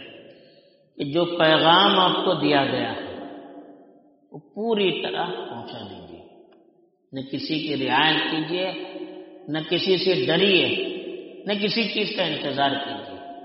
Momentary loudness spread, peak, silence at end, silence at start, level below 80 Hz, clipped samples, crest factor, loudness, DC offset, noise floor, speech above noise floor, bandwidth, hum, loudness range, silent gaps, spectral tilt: 20 LU; -4 dBFS; 0 s; 0 s; -68 dBFS; under 0.1%; 20 dB; -22 LUFS; under 0.1%; -60 dBFS; 38 dB; 5.8 kHz; none; 9 LU; none; -2 dB/octave